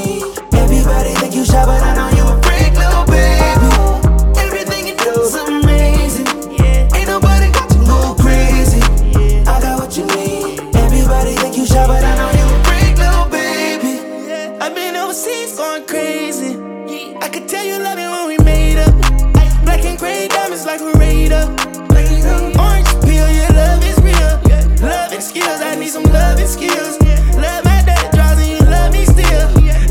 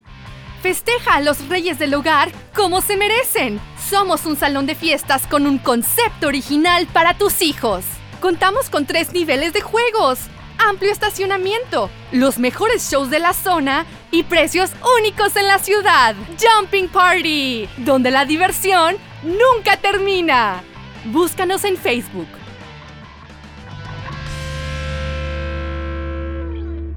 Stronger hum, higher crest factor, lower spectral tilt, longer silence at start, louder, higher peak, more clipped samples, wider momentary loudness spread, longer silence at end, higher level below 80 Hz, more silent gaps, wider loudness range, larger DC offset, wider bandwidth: neither; second, 10 dB vs 16 dB; first, -5.5 dB/octave vs -3.5 dB/octave; about the same, 0 s vs 0.05 s; first, -13 LUFS vs -16 LUFS; about the same, 0 dBFS vs 0 dBFS; neither; second, 8 LU vs 13 LU; about the same, 0 s vs 0 s; first, -12 dBFS vs -36 dBFS; neither; second, 5 LU vs 10 LU; neither; second, 17 kHz vs over 20 kHz